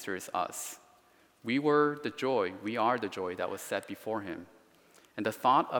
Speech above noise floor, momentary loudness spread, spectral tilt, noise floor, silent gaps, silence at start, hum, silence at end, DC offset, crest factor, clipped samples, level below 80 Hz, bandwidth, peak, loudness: 33 dB; 15 LU; -4.5 dB/octave; -64 dBFS; none; 0 s; none; 0 s; under 0.1%; 20 dB; under 0.1%; -80 dBFS; 18 kHz; -12 dBFS; -32 LUFS